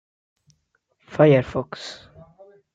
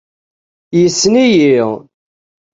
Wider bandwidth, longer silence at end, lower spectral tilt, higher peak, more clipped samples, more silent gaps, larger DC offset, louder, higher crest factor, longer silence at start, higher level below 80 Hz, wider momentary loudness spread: about the same, 7.8 kHz vs 8 kHz; about the same, 0.8 s vs 0.75 s; first, -7.5 dB/octave vs -4.5 dB/octave; about the same, -4 dBFS vs -2 dBFS; neither; neither; neither; second, -19 LUFS vs -11 LUFS; first, 20 dB vs 12 dB; first, 1.1 s vs 0.7 s; about the same, -56 dBFS vs -54 dBFS; first, 20 LU vs 10 LU